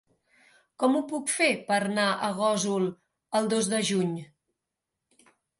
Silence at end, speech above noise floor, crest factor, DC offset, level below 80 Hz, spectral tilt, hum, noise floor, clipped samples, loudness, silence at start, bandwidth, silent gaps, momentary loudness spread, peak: 1.35 s; 59 dB; 18 dB; under 0.1%; -76 dBFS; -4 dB/octave; none; -86 dBFS; under 0.1%; -27 LUFS; 0.8 s; 11.5 kHz; none; 6 LU; -10 dBFS